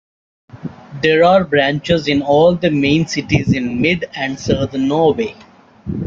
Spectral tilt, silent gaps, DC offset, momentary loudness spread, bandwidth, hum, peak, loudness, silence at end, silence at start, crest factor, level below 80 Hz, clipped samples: -6 dB/octave; none; under 0.1%; 15 LU; 7.6 kHz; none; -2 dBFS; -15 LUFS; 0 s; 0.55 s; 14 dB; -44 dBFS; under 0.1%